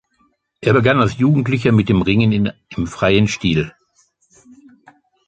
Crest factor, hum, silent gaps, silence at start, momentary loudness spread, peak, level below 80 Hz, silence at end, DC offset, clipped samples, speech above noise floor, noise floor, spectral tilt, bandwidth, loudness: 16 dB; none; none; 0.6 s; 8 LU; -2 dBFS; -40 dBFS; 1.6 s; under 0.1%; under 0.1%; 47 dB; -62 dBFS; -6.5 dB/octave; 8.8 kHz; -16 LUFS